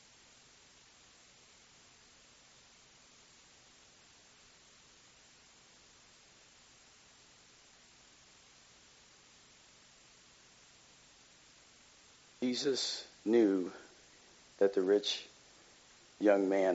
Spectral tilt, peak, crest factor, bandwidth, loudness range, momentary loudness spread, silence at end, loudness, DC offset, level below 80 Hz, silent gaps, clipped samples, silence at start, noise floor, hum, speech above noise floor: -3 dB/octave; -14 dBFS; 24 dB; 7.6 kHz; 25 LU; 29 LU; 0 s; -33 LUFS; under 0.1%; -80 dBFS; none; under 0.1%; 12.4 s; -62 dBFS; none; 31 dB